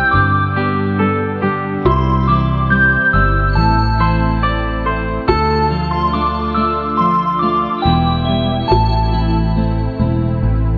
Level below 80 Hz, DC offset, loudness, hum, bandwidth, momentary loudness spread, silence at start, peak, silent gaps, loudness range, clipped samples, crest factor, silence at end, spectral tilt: -22 dBFS; under 0.1%; -15 LUFS; none; 5.4 kHz; 5 LU; 0 s; 0 dBFS; none; 2 LU; under 0.1%; 14 dB; 0 s; -9 dB/octave